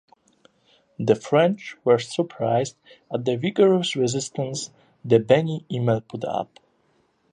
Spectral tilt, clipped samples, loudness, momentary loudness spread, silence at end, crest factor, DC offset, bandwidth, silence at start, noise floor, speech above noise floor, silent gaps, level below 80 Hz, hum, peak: -5.5 dB/octave; under 0.1%; -23 LUFS; 12 LU; 0.9 s; 20 dB; under 0.1%; 10.5 kHz; 1 s; -65 dBFS; 43 dB; none; -64 dBFS; none; -4 dBFS